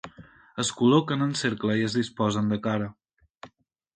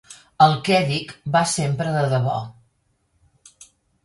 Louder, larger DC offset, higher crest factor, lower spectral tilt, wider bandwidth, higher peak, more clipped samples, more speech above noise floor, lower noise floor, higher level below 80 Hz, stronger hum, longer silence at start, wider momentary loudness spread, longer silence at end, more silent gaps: second, -25 LUFS vs -20 LUFS; neither; about the same, 20 dB vs 20 dB; about the same, -5 dB/octave vs -5 dB/octave; second, 9.4 kHz vs 11.5 kHz; second, -8 dBFS vs -2 dBFS; neither; second, 34 dB vs 47 dB; second, -59 dBFS vs -67 dBFS; about the same, -60 dBFS vs -58 dBFS; neither; about the same, 0.05 s vs 0.1 s; about the same, 11 LU vs 9 LU; second, 0.5 s vs 1.55 s; first, 3.30-3.34 s vs none